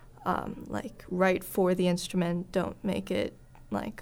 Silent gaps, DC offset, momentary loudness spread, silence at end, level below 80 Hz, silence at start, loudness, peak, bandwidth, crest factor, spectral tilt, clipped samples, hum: none; under 0.1%; 10 LU; 0 s; -54 dBFS; 0 s; -31 LUFS; -12 dBFS; 20 kHz; 18 dB; -6 dB/octave; under 0.1%; none